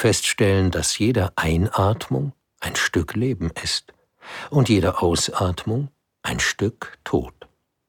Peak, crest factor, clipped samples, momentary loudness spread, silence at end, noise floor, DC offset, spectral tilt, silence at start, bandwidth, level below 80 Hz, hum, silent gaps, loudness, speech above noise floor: -4 dBFS; 18 dB; under 0.1%; 13 LU; 0.6 s; -51 dBFS; under 0.1%; -4.5 dB/octave; 0 s; 18.5 kHz; -40 dBFS; none; none; -22 LUFS; 29 dB